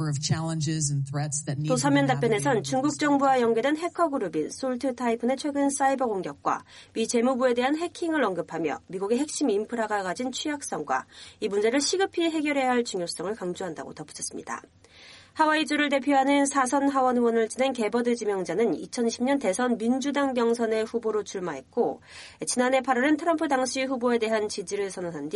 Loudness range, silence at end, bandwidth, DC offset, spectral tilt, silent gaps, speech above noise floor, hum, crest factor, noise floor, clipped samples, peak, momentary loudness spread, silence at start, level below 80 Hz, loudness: 4 LU; 0 s; 11.5 kHz; under 0.1%; -4.5 dB/octave; none; 25 dB; none; 16 dB; -51 dBFS; under 0.1%; -10 dBFS; 9 LU; 0 s; -66 dBFS; -26 LUFS